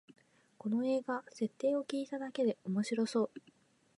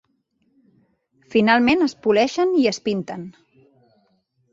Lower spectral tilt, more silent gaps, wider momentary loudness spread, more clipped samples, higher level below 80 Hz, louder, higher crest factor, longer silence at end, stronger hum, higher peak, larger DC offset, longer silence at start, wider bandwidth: about the same, -6 dB/octave vs -5 dB/octave; neither; second, 7 LU vs 16 LU; neither; second, -88 dBFS vs -58 dBFS; second, -36 LUFS vs -19 LUFS; about the same, 16 dB vs 20 dB; second, 0.6 s vs 1.2 s; neither; second, -22 dBFS vs -2 dBFS; neither; second, 0.65 s vs 1.3 s; first, 11.5 kHz vs 7.8 kHz